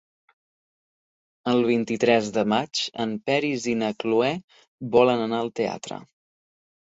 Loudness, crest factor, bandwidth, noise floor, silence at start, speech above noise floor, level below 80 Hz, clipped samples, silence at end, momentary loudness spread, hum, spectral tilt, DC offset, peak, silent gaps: -24 LUFS; 22 dB; 8 kHz; under -90 dBFS; 1.45 s; over 67 dB; -66 dBFS; under 0.1%; 0.8 s; 13 LU; none; -5 dB/octave; under 0.1%; -4 dBFS; 4.44-4.48 s, 4.68-4.78 s